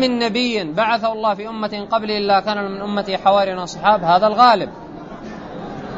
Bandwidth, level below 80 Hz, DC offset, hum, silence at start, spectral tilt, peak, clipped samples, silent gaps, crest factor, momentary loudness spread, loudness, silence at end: 8 kHz; -50 dBFS; under 0.1%; none; 0 s; -5 dB/octave; 0 dBFS; under 0.1%; none; 18 dB; 19 LU; -17 LUFS; 0 s